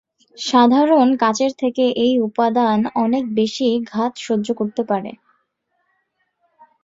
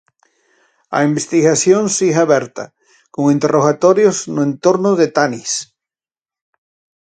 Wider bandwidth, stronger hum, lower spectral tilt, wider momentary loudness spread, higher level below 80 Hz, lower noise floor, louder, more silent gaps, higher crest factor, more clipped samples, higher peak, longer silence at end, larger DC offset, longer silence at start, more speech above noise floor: second, 7.8 kHz vs 9.6 kHz; neither; about the same, -5 dB/octave vs -4.5 dB/octave; about the same, 9 LU vs 10 LU; about the same, -64 dBFS vs -62 dBFS; second, -70 dBFS vs under -90 dBFS; second, -18 LUFS vs -14 LUFS; neither; about the same, 16 dB vs 16 dB; neither; about the same, -2 dBFS vs 0 dBFS; first, 1.7 s vs 1.35 s; neither; second, 0.4 s vs 0.9 s; second, 52 dB vs over 76 dB